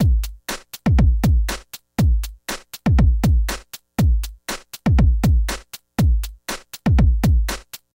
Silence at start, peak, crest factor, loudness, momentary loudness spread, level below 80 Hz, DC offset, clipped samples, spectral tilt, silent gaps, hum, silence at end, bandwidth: 0 s; -6 dBFS; 12 dB; -20 LUFS; 13 LU; -20 dBFS; under 0.1%; under 0.1%; -6 dB/octave; none; none; 0.25 s; 17 kHz